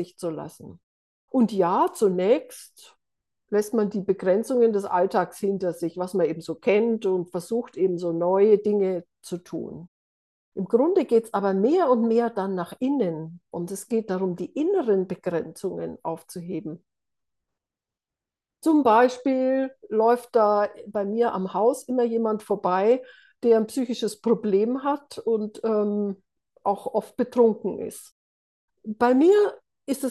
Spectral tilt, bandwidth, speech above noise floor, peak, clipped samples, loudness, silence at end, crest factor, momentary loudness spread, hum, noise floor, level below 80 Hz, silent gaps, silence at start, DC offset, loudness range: -6.5 dB/octave; 12.5 kHz; 67 dB; -6 dBFS; under 0.1%; -24 LUFS; 0 s; 18 dB; 13 LU; none; -90 dBFS; -74 dBFS; 0.83-1.28 s, 9.88-10.52 s, 28.12-28.68 s; 0 s; under 0.1%; 5 LU